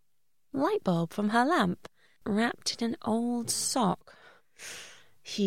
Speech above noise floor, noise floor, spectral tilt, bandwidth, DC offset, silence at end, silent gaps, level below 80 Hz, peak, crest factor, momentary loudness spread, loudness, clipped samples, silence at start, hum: 53 dB; -82 dBFS; -4 dB/octave; 16.5 kHz; 0.2%; 0 s; none; -68 dBFS; -12 dBFS; 18 dB; 16 LU; -29 LUFS; under 0.1%; 0.55 s; none